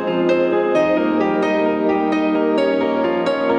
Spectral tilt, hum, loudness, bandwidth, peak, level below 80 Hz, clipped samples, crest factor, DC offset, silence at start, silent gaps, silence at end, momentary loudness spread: -6.5 dB/octave; none; -17 LUFS; 8.8 kHz; -6 dBFS; -54 dBFS; under 0.1%; 12 dB; under 0.1%; 0 s; none; 0 s; 2 LU